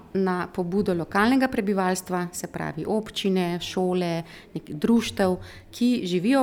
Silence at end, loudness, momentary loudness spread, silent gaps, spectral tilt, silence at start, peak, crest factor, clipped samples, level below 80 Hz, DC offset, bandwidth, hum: 0 s; -25 LUFS; 10 LU; none; -5.5 dB/octave; 0.15 s; -8 dBFS; 16 dB; under 0.1%; -54 dBFS; under 0.1%; 17.5 kHz; none